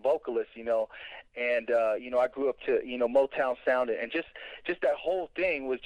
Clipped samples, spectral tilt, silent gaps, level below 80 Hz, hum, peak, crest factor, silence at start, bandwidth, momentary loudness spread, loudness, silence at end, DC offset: under 0.1%; -5.5 dB/octave; none; -64 dBFS; none; -14 dBFS; 16 dB; 0.05 s; 9.2 kHz; 9 LU; -30 LUFS; 0 s; under 0.1%